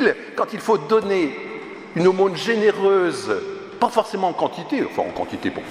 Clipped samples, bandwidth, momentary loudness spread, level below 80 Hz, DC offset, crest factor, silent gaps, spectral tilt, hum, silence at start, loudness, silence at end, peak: under 0.1%; 13.5 kHz; 9 LU; -60 dBFS; under 0.1%; 18 dB; none; -5.5 dB/octave; none; 0 s; -21 LUFS; 0 s; -4 dBFS